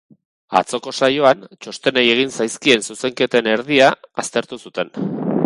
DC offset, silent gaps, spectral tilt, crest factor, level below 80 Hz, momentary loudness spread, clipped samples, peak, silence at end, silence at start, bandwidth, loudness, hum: under 0.1%; none; -3.5 dB/octave; 18 dB; -62 dBFS; 11 LU; under 0.1%; 0 dBFS; 0 s; 0.5 s; 11.5 kHz; -17 LUFS; none